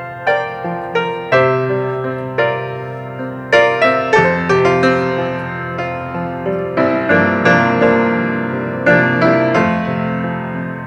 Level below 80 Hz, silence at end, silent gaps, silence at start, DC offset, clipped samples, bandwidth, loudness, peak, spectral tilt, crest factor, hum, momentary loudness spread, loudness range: -50 dBFS; 0 s; none; 0 s; under 0.1%; under 0.1%; 9.4 kHz; -15 LUFS; 0 dBFS; -7 dB/octave; 16 dB; none; 10 LU; 3 LU